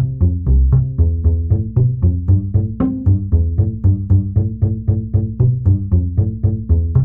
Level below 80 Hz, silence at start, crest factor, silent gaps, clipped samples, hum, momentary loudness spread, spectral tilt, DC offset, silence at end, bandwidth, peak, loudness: -22 dBFS; 0 s; 12 dB; none; under 0.1%; none; 4 LU; -15 dB/octave; under 0.1%; 0 s; 1.6 kHz; -2 dBFS; -16 LUFS